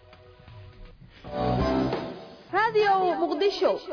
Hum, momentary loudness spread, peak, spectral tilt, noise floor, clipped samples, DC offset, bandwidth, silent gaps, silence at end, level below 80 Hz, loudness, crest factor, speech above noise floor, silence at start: none; 16 LU; -14 dBFS; -6.5 dB/octave; -51 dBFS; under 0.1%; under 0.1%; 5.4 kHz; none; 0 s; -44 dBFS; -25 LUFS; 14 dB; 27 dB; 0.5 s